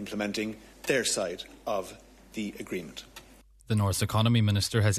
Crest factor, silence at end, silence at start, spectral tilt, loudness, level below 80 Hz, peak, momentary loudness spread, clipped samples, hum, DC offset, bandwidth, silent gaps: 18 dB; 0 s; 0 s; -4.5 dB/octave; -29 LUFS; -54 dBFS; -10 dBFS; 18 LU; under 0.1%; none; under 0.1%; 14 kHz; none